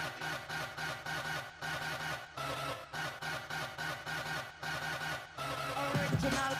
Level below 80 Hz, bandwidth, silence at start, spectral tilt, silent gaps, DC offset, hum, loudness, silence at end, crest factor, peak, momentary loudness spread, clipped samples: -60 dBFS; 15.5 kHz; 0 s; -4 dB/octave; none; under 0.1%; none; -38 LUFS; 0 s; 18 dB; -20 dBFS; 7 LU; under 0.1%